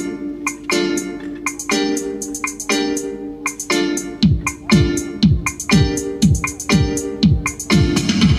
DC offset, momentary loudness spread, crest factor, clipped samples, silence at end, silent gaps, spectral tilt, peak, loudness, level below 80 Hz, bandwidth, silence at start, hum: under 0.1%; 9 LU; 16 dB; under 0.1%; 0 s; none; -4.5 dB/octave; -2 dBFS; -18 LUFS; -30 dBFS; 14.5 kHz; 0 s; none